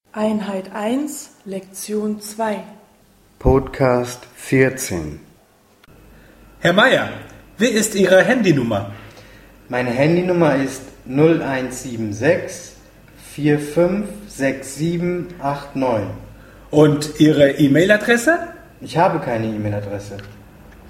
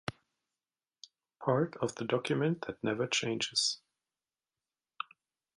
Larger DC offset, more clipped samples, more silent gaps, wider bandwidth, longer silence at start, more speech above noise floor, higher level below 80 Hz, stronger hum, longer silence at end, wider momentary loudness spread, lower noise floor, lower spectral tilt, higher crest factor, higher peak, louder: neither; neither; neither; first, 16.5 kHz vs 11.5 kHz; about the same, 0.15 s vs 0.1 s; second, 36 dB vs over 57 dB; first, -40 dBFS vs -72 dBFS; neither; second, 0 s vs 1.8 s; first, 17 LU vs 14 LU; second, -53 dBFS vs under -90 dBFS; first, -5.5 dB/octave vs -4 dB/octave; about the same, 18 dB vs 22 dB; first, 0 dBFS vs -14 dBFS; first, -18 LUFS vs -33 LUFS